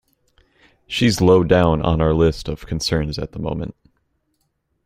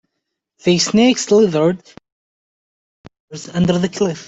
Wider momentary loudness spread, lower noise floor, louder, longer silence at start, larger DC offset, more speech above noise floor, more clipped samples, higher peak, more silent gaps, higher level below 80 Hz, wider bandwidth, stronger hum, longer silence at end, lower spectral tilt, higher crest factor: about the same, 13 LU vs 15 LU; second, -70 dBFS vs -77 dBFS; second, -18 LUFS vs -15 LUFS; first, 0.9 s vs 0.65 s; neither; second, 52 dB vs 62 dB; neither; about the same, -2 dBFS vs -2 dBFS; second, none vs 2.12-3.04 s, 3.20-3.28 s; first, -36 dBFS vs -52 dBFS; first, 15 kHz vs 8.2 kHz; neither; first, 1.15 s vs 0.05 s; about the same, -6 dB/octave vs -5 dB/octave; about the same, 18 dB vs 16 dB